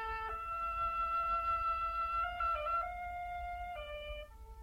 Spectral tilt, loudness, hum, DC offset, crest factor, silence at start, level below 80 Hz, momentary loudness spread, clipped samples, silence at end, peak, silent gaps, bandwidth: -4.5 dB/octave; -37 LUFS; none; under 0.1%; 12 dB; 0 s; -52 dBFS; 11 LU; under 0.1%; 0 s; -26 dBFS; none; 16 kHz